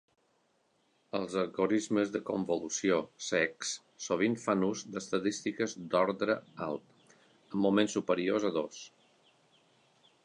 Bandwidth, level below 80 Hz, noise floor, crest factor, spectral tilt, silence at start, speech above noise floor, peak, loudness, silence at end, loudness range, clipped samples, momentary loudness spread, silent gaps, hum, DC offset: 11 kHz; -74 dBFS; -73 dBFS; 20 dB; -4.5 dB/octave; 1.15 s; 41 dB; -14 dBFS; -32 LUFS; 1.35 s; 2 LU; under 0.1%; 10 LU; none; none; under 0.1%